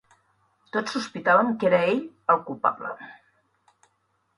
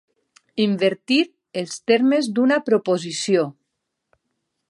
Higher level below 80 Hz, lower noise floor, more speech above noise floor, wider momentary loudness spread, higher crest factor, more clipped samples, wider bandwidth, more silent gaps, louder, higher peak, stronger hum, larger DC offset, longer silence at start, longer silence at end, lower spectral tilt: first, -68 dBFS vs -74 dBFS; second, -71 dBFS vs -78 dBFS; second, 47 dB vs 59 dB; first, 15 LU vs 11 LU; about the same, 20 dB vs 18 dB; neither; about the same, 11 kHz vs 11.5 kHz; neither; second, -24 LUFS vs -20 LUFS; about the same, -6 dBFS vs -4 dBFS; neither; neither; first, 0.75 s vs 0.55 s; about the same, 1.25 s vs 1.2 s; about the same, -5.5 dB/octave vs -4.5 dB/octave